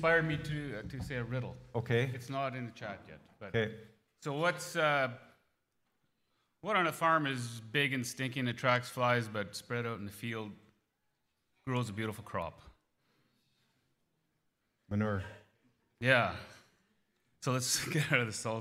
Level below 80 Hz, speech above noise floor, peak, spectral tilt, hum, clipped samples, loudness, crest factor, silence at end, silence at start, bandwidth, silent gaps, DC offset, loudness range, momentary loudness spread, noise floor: -64 dBFS; 47 dB; -12 dBFS; -4.5 dB/octave; none; under 0.1%; -34 LUFS; 24 dB; 0 s; 0 s; 16 kHz; none; under 0.1%; 10 LU; 15 LU; -81 dBFS